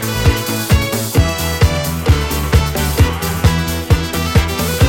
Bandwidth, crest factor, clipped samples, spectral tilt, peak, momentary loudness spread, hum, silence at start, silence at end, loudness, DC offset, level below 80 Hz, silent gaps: 17 kHz; 14 dB; under 0.1%; -5 dB/octave; 0 dBFS; 2 LU; none; 0 s; 0 s; -15 LUFS; under 0.1%; -20 dBFS; none